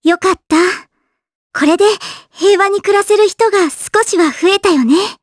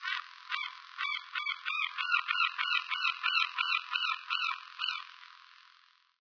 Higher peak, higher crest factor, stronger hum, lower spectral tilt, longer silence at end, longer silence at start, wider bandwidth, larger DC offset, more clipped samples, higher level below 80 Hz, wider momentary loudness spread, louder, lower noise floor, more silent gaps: first, 0 dBFS vs -12 dBFS; second, 12 dB vs 22 dB; neither; first, -2.5 dB/octave vs 9.5 dB/octave; second, 0.1 s vs 0.8 s; about the same, 0.05 s vs 0 s; first, 11 kHz vs 5.4 kHz; neither; neither; first, -52 dBFS vs under -90 dBFS; second, 5 LU vs 9 LU; first, -12 LUFS vs -32 LUFS; about the same, -67 dBFS vs -65 dBFS; first, 1.35-1.50 s vs none